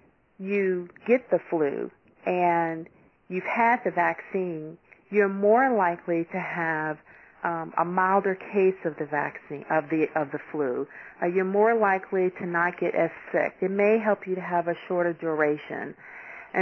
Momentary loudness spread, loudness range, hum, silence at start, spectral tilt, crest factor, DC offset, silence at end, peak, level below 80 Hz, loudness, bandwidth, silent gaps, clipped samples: 12 LU; 2 LU; none; 0.4 s; -9 dB/octave; 18 dB; under 0.1%; 0 s; -10 dBFS; -72 dBFS; -26 LUFS; 6.2 kHz; none; under 0.1%